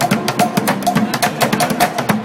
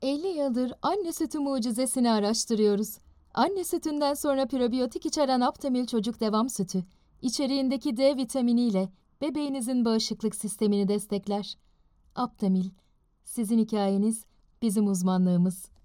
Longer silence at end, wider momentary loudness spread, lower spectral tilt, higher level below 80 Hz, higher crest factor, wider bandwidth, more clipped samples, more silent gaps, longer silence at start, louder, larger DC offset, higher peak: second, 0 s vs 0.2 s; second, 1 LU vs 9 LU; second, -4 dB/octave vs -5.5 dB/octave; first, -52 dBFS vs -62 dBFS; about the same, 16 dB vs 16 dB; about the same, 17 kHz vs 17 kHz; neither; neither; about the same, 0 s vs 0 s; first, -16 LUFS vs -28 LUFS; neither; first, 0 dBFS vs -12 dBFS